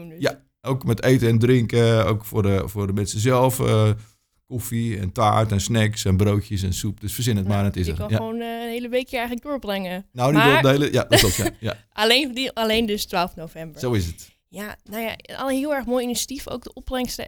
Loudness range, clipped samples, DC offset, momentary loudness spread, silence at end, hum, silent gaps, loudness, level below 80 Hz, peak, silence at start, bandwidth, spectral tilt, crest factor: 7 LU; under 0.1%; under 0.1%; 13 LU; 0 s; none; none; -21 LUFS; -42 dBFS; 0 dBFS; 0 s; over 20 kHz; -5 dB/octave; 20 dB